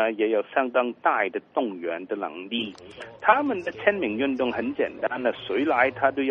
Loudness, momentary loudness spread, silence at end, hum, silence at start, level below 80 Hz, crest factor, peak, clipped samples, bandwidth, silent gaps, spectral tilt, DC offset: -25 LUFS; 9 LU; 0 s; none; 0 s; -66 dBFS; 22 dB; -2 dBFS; under 0.1%; 8 kHz; none; -6.5 dB/octave; under 0.1%